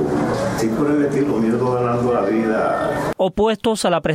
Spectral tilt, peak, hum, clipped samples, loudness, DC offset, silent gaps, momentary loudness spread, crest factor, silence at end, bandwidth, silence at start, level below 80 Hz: -6 dB/octave; -6 dBFS; none; under 0.1%; -19 LUFS; under 0.1%; none; 2 LU; 12 dB; 0 s; 16 kHz; 0 s; -44 dBFS